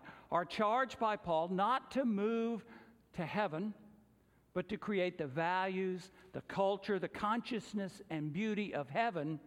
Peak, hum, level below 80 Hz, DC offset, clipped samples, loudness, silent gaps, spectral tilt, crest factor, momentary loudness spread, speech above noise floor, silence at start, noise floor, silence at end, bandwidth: -20 dBFS; none; -72 dBFS; under 0.1%; under 0.1%; -37 LUFS; none; -6.5 dB/octave; 18 dB; 10 LU; 32 dB; 0 s; -69 dBFS; 0 s; 12.5 kHz